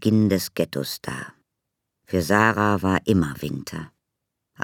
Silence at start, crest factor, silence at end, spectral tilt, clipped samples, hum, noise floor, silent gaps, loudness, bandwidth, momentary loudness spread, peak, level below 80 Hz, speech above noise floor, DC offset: 0 s; 22 dB; 0 s; -6 dB/octave; under 0.1%; none; -81 dBFS; none; -22 LUFS; 18.5 kHz; 16 LU; -2 dBFS; -52 dBFS; 59 dB; under 0.1%